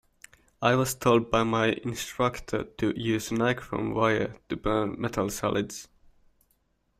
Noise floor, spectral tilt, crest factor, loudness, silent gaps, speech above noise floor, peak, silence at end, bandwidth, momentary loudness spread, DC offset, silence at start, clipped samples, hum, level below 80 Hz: -71 dBFS; -5 dB/octave; 20 dB; -27 LUFS; none; 44 dB; -8 dBFS; 1.15 s; 16 kHz; 9 LU; under 0.1%; 0.6 s; under 0.1%; none; -52 dBFS